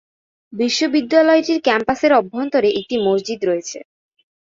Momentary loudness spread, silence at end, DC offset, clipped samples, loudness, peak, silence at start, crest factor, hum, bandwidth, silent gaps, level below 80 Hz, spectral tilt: 9 LU; 0.7 s; under 0.1%; under 0.1%; -17 LUFS; -2 dBFS; 0.5 s; 16 dB; none; 7.8 kHz; none; -58 dBFS; -4 dB/octave